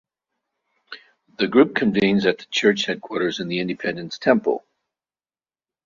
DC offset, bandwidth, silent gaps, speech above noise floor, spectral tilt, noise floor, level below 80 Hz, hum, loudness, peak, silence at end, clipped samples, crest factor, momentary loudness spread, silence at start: under 0.1%; 7.2 kHz; none; over 70 dB; -5 dB/octave; under -90 dBFS; -62 dBFS; none; -21 LUFS; -2 dBFS; 1.25 s; under 0.1%; 20 dB; 14 LU; 0.9 s